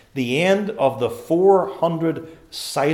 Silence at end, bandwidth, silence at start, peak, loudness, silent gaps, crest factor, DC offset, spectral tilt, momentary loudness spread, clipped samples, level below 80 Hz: 0 s; 16 kHz; 0.15 s; -2 dBFS; -20 LUFS; none; 18 dB; under 0.1%; -5.5 dB/octave; 13 LU; under 0.1%; -60 dBFS